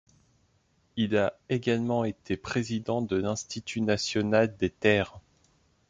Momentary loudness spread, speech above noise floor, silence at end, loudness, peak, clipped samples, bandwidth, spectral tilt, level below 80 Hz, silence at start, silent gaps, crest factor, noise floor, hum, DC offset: 8 LU; 41 dB; 0.7 s; -28 LUFS; -8 dBFS; under 0.1%; 9.4 kHz; -5.5 dB/octave; -56 dBFS; 0.95 s; none; 20 dB; -68 dBFS; none; under 0.1%